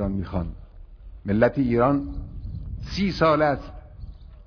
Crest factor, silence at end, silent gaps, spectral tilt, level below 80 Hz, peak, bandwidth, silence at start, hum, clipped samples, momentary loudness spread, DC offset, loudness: 20 dB; 0 s; none; -8 dB/octave; -38 dBFS; -6 dBFS; 5.4 kHz; 0 s; none; under 0.1%; 23 LU; under 0.1%; -23 LUFS